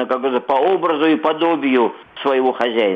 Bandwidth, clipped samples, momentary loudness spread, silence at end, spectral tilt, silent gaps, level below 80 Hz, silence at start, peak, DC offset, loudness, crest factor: 5.8 kHz; under 0.1%; 4 LU; 0 s; -6.5 dB/octave; none; -66 dBFS; 0 s; -4 dBFS; under 0.1%; -17 LUFS; 14 dB